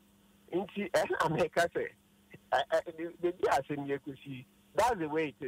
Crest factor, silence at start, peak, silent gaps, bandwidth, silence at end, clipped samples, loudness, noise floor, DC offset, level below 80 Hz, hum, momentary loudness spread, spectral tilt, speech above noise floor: 16 dB; 0.5 s; -18 dBFS; none; 16 kHz; 0 s; under 0.1%; -33 LUFS; -63 dBFS; under 0.1%; -64 dBFS; none; 12 LU; -5 dB/octave; 31 dB